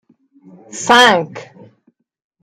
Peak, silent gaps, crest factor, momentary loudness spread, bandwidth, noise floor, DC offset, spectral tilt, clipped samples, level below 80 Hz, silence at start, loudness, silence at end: 0 dBFS; none; 18 dB; 24 LU; 16 kHz; -59 dBFS; under 0.1%; -2.5 dB/octave; under 0.1%; -60 dBFS; 0.75 s; -11 LUFS; 1 s